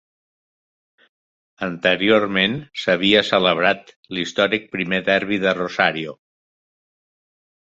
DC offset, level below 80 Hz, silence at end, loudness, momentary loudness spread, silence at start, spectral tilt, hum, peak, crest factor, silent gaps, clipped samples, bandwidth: under 0.1%; -58 dBFS; 1.6 s; -19 LUFS; 12 LU; 1.6 s; -5 dB/octave; none; 0 dBFS; 22 dB; 3.96-4.03 s; under 0.1%; 7.8 kHz